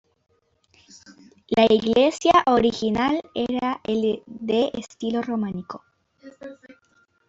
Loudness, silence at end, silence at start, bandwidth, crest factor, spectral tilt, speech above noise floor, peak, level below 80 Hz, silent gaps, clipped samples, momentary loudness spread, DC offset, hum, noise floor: -22 LUFS; 0.75 s; 1.1 s; 8 kHz; 20 dB; -5 dB/octave; 42 dB; -4 dBFS; -54 dBFS; none; under 0.1%; 22 LU; under 0.1%; none; -63 dBFS